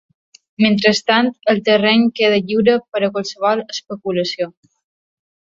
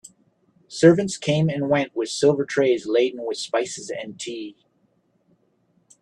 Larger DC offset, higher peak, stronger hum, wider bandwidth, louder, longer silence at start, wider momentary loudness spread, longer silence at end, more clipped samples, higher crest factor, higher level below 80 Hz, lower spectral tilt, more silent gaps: neither; about the same, -2 dBFS vs -2 dBFS; neither; second, 7.6 kHz vs 11 kHz; first, -16 LUFS vs -22 LUFS; first, 0.6 s vs 0.05 s; second, 9 LU vs 16 LU; second, 1.05 s vs 1.5 s; neither; second, 16 dB vs 22 dB; about the same, -60 dBFS vs -64 dBFS; about the same, -5 dB/octave vs -5.5 dB/octave; first, 2.88-2.92 s vs none